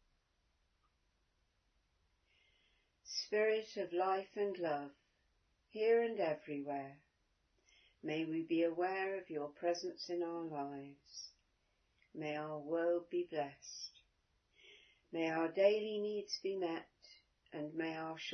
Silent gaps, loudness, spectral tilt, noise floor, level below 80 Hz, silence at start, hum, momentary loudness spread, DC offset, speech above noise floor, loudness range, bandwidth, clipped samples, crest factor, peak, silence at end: none; -39 LUFS; -3 dB/octave; -80 dBFS; -84 dBFS; 3.05 s; none; 17 LU; under 0.1%; 41 dB; 4 LU; 6.4 kHz; under 0.1%; 22 dB; -18 dBFS; 0 s